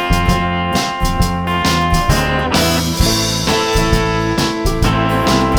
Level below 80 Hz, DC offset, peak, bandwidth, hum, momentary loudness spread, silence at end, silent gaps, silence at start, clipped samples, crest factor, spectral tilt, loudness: -22 dBFS; under 0.1%; 0 dBFS; over 20 kHz; none; 3 LU; 0 s; none; 0 s; under 0.1%; 14 dB; -4.5 dB/octave; -15 LUFS